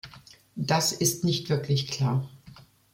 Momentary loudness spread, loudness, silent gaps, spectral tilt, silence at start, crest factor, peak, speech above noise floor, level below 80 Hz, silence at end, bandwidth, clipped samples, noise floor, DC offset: 17 LU; -26 LUFS; none; -4 dB/octave; 0.05 s; 20 dB; -8 dBFS; 26 dB; -60 dBFS; 0.35 s; 16.5 kHz; under 0.1%; -52 dBFS; under 0.1%